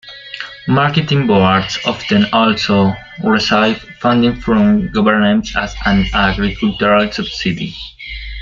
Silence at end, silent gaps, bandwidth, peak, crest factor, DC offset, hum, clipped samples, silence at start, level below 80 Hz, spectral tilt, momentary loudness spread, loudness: 0 s; none; 7.4 kHz; 0 dBFS; 14 dB; under 0.1%; none; under 0.1%; 0.05 s; -32 dBFS; -6 dB/octave; 13 LU; -14 LUFS